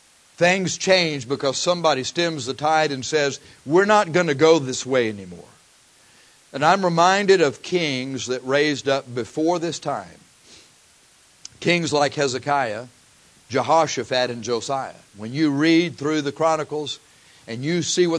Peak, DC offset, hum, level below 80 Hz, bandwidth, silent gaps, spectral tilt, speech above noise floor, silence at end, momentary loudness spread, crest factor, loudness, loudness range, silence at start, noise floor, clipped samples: -2 dBFS; under 0.1%; none; -66 dBFS; 11 kHz; none; -4 dB/octave; 34 dB; 0 s; 12 LU; 20 dB; -21 LUFS; 5 LU; 0.4 s; -54 dBFS; under 0.1%